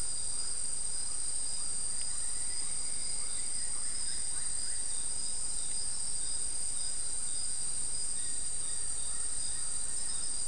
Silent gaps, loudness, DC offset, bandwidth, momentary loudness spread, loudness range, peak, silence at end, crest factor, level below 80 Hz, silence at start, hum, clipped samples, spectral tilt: none; -33 LUFS; 3%; 12 kHz; 1 LU; 0 LU; -20 dBFS; 0 s; 14 dB; -54 dBFS; 0 s; none; under 0.1%; 0.5 dB/octave